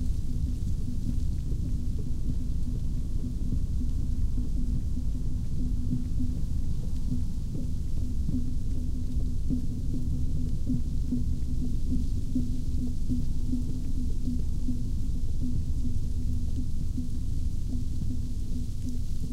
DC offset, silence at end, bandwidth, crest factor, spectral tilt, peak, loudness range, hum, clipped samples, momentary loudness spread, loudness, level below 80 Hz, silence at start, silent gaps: under 0.1%; 0 s; 9 kHz; 12 dB; -8 dB/octave; -14 dBFS; 1 LU; none; under 0.1%; 3 LU; -33 LUFS; -28 dBFS; 0 s; none